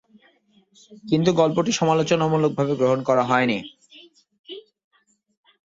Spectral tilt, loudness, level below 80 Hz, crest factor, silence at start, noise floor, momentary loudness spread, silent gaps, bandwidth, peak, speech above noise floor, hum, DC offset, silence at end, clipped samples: -5.5 dB/octave; -21 LUFS; -62 dBFS; 20 dB; 0.9 s; -60 dBFS; 21 LU; 4.39-4.44 s; 7.8 kHz; -4 dBFS; 40 dB; none; under 0.1%; 1.05 s; under 0.1%